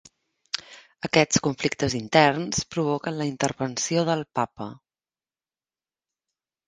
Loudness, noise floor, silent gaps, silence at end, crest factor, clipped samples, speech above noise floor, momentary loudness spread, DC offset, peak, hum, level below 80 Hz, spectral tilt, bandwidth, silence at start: -24 LUFS; under -90 dBFS; none; 1.95 s; 26 dB; under 0.1%; over 66 dB; 14 LU; under 0.1%; 0 dBFS; none; -56 dBFS; -4 dB/octave; 10.5 kHz; 0.55 s